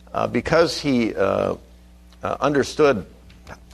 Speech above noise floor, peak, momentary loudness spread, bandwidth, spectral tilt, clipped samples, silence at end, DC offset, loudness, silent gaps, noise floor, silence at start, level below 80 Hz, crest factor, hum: 27 dB; -2 dBFS; 9 LU; 13.5 kHz; -5.5 dB/octave; under 0.1%; 0.2 s; under 0.1%; -21 LUFS; none; -47 dBFS; 0.15 s; -46 dBFS; 20 dB; none